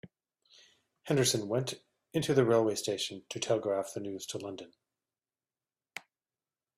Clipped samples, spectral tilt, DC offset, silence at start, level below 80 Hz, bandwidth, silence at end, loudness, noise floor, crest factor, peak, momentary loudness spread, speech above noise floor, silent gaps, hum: under 0.1%; -4.5 dB/octave; under 0.1%; 0.05 s; -72 dBFS; 15.5 kHz; 0.8 s; -32 LUFS; under -90 dBFS; 22 dB; -14 dBFS; 20 LU; over 59 dB; none; none